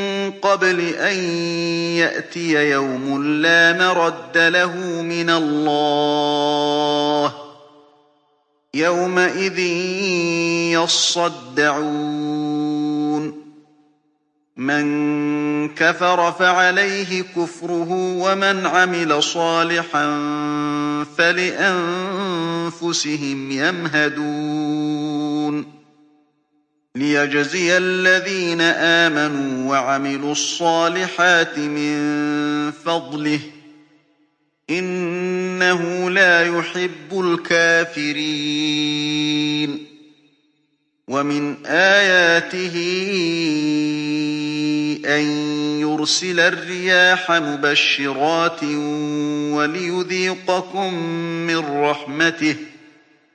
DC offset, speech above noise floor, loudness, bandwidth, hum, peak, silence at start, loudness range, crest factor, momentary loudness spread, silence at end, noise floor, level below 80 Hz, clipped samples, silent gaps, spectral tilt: under 0.1%; 48 dB; -18 LUFS; 9.8 kHz; none; 0 dBFS; 0 s; 6 LU; 18 dB; 9 LU; 0.65 s; -67 dBFS; -72 dBFS; under 0.1%; none; -3.5 dB/octave